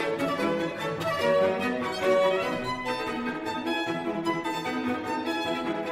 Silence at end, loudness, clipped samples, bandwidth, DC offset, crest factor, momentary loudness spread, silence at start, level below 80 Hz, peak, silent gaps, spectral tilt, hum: 0 s; -28 LUFS; under 0.1%; 16 kHz; under 0.1%; 16 dB; 7 LU; 0 s; -60 dBFS; -12 dBFS; none; -5 dB/octave; none